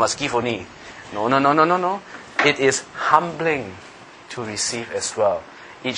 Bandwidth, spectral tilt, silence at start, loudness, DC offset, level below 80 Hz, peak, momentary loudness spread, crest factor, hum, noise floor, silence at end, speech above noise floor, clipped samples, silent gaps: 10.5 kHz; -3.5 dB/octave; 0 s; -20 LUFS; under 0.1%; -58 dBFS; 0 dBFS; 18 LU; 22 dB; none; -40 dBFS; 0 s; 20 dB; under 0.1%; none